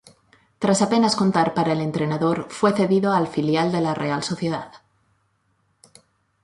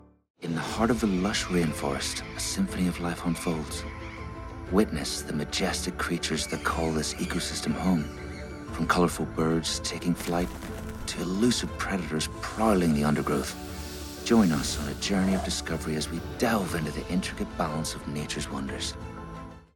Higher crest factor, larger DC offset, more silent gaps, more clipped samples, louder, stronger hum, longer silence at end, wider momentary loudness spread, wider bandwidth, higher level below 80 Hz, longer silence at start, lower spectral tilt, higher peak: about the same, 16 dB vs 20 dB; neither; neither; neither; first, -21 LUFS vs -28 LUFS; neither; first, 1.65 s vs 0.1 s; second, 7 LU vs 12 LU; second, 11.5 kHz vs 18 kHz; second, -62 dBFS vs -44 dBFS; first, 0.6 s vs 0.4 s; about the same, -5.5 dB/octave vs -4.5 dB/octave; about the same, -6 dBFS vs -8 dBFS